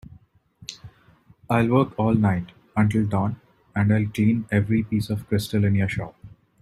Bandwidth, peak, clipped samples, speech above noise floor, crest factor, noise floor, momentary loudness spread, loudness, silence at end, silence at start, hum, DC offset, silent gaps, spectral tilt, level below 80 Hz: 13.5 kHz; -6 dBFS; under 0.1%; 34 dB; 18 dB; -56 dBFS; 18 LU; -23 LUFS; 0.35 s; 0.6 s; none; under 0.1%; none; -7.5 dB/octave; -52 dBFS